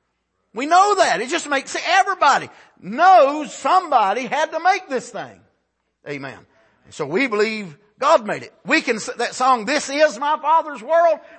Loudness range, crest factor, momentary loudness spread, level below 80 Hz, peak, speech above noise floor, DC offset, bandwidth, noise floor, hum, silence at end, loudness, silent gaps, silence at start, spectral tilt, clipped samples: 8 LU; 16 dB; 16 LU; -72 dBFS; -2 dBFS; 53 dB; under 0.1%; 8.8 kHz; -71 dBFS; none; 0.2 s; -18 LUFS; none; 0.55 s; -3 dB/octave; under 0.1%